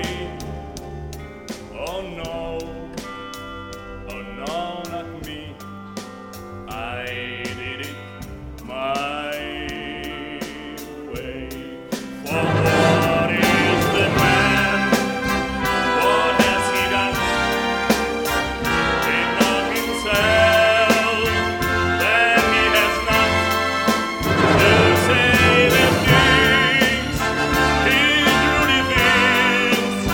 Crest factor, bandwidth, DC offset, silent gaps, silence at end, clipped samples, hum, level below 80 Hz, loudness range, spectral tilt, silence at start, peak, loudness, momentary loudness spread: 18 dB; over 20 kHz; under 0.1%; none; 0 s; under 0.1%; none; -38 dBFS; 16 LU; -4 dB/octave; 0 s; -2 dBFS; -17 LUFS; 20 LU